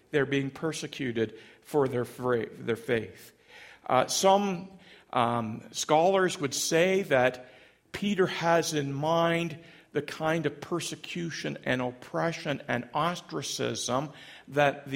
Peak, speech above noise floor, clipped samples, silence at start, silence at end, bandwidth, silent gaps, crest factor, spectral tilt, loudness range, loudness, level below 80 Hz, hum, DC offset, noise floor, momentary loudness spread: -8 dBFS; 24 dB; under 0.1%; 0.15 s; 0 s; 16.5 kHz; none; 20 dB; -4 dB/octave; 5 LU; -29 LUFS; -66 dBFS; none; under 0.1%; -52 dBFS; 11 LU